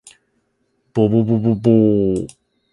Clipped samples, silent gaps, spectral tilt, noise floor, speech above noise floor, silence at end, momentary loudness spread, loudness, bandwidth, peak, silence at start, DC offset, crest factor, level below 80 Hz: under 0.1%; none; -9.5 dB/octave; -66 dBFS; 52 dB; 0.45 s; 11 LU; -16 LUFS; 11 kHz; 0 dBFS; 0.95 s; under 0.1%; 16 dB; -48 dBFS